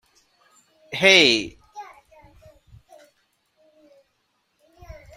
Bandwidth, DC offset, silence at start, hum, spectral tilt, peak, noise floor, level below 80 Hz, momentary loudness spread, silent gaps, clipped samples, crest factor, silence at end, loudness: 16 kHz; under 0.1%; 0.9 s; none; -2.5 dB/octave; -2 dBFS; -71 dBFS; -56 dBFS; 29 LU; none; under 0.1%; 24 dB; 0.25 s; -15 LUFS